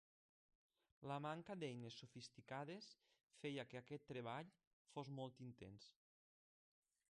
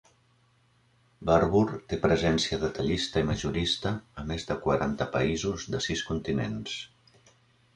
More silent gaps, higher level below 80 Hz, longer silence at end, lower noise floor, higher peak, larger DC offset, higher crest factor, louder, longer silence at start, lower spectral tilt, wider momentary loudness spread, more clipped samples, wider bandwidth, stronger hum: first, 3.23-3.28 s, 4.67-4.85 s vs none; second, -86 dBFS vs -46 dBFS; first, 1.2 s vs 0.9 s; first, under -90 dBFS vs -65 dBFS; second, -38 dBFS vs -10 dBFS; neither; about the same, 18 dB vs 20 dB; second, -54 LUFS vs -28 LUFS; second, 1 s vs 1.2 s; about the same, -6 dB/octave vs -5 dB/octave; about the same, 11 LU vs 11 LU; neither; about the same, 10.5 kHz vs 11 kHz; neither